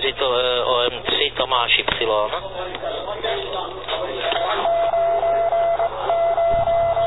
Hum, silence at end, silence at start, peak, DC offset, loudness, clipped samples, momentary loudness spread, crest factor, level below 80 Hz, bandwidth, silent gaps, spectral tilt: none; 0 s; 0 s; -2 dBFS; 0.8%; -20 LUFS; under 0.1%; 10 LU; 18 dB; -44 dBFS; 4.1 kHz; none; -6 dB/octave